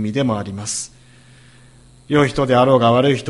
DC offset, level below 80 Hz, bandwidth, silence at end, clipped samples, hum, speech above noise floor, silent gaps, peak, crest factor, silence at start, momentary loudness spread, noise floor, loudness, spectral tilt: under 0.1%; -48 dBFS; 11.5 kHz; 0 s; under 0.1%; none; 30 dB; none; 0 dBFS; 18 dB; 0 s; 11 LU; -46 dBFS; -17 LUFS; -5.5 dB/octave